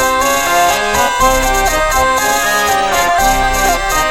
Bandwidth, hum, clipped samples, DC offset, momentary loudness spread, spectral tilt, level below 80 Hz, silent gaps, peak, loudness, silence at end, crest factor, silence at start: 17 kHz; none; under 0.1%; under 0.1%; 1 LU; -2 dB/octave; -24 dBFS; none; 0 dBFS; -12 LUFS; 0 s; 12 dB; 0 s